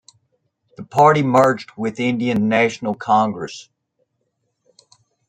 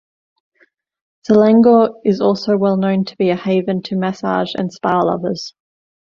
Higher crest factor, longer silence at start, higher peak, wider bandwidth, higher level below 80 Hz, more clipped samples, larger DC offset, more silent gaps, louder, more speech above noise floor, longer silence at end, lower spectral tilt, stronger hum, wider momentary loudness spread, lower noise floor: about the same, 18 dB vs 14 dB; second, 0.8 s vs 1.3 s; about the same, -2 dBFS vs -2 dBFS; first, 15.5 kHz vs 7.2 kHz; about the same, -62 dBFS vs -58 dBFS; neither; neither; neither; about the same, -17 LUFS vs -15 LUFS; first, 54 dB vs 43 dB; first, 1.65 s vs 0.65 s; second, -6 dB/octave vs -7.5 dB/octave; neither; about the same, 13 LU vs 11 LU; first, -72 dBFS vs -58 dBFS